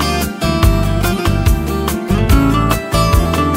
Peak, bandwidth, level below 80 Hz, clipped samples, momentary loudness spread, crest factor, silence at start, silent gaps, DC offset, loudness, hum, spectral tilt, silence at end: 0 dBFS; 16.5 kHz; -18 dBFS; under 0.1%; 5 LU; 14 dB; 0 s; none; under 0.1%; -14 LUFS; none; -5.5 dB/octave; 0 s